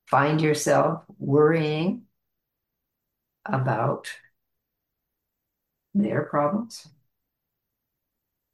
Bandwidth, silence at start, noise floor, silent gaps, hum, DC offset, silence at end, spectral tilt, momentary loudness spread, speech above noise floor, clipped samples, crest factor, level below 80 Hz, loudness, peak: 12.5 kHz; 0.1 s; -82 dBFS; none; none; under 0.1%; 1.7 s; -6 dB/octave; 18 LU; 59 dB; under 0.1%; 20 dB; -70 dBFS; -24 LUFS; -6 dBFS